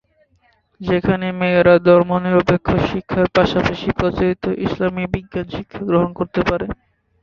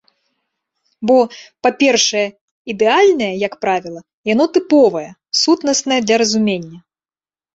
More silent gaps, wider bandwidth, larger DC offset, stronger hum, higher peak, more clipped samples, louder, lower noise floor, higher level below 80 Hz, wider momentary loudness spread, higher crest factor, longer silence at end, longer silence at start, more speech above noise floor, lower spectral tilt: second, none vs 2.41-2.65 s, 4.14-4.24 s; second, 7 kHz vs 8 kHz; neither; neither; about the same, -2 dBFS vs -2 dBFS; neither; about the same, -17 LUFS vs -15 LUFS; second, -59 dBFS vs under -90 dBFS; first, -38 dBFS vs -60 dBFS; about the same, 13 LU vs 12 LU; about the same, 16 dB vs 14 dB; second, 0.5 s vs 0.75 s; second, 0.8 s vs 1 s; second, 43 dB vs over 75 dB; first, -8 dB/octave vs -3 dB/octave